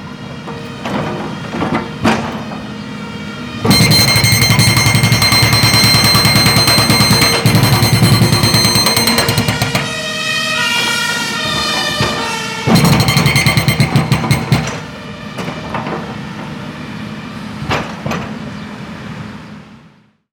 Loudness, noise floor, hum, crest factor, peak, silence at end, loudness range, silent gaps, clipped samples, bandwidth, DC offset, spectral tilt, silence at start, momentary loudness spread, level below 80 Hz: -11 LUFS; -47 dBFS; none; 14 dB; 0 dBFS; 0.55 s; 14 LU; none; under 0.1%; over 20 kHz; under 0.1%; -3.5 dB/octave; 0 s; 18 LU; -34 dBFS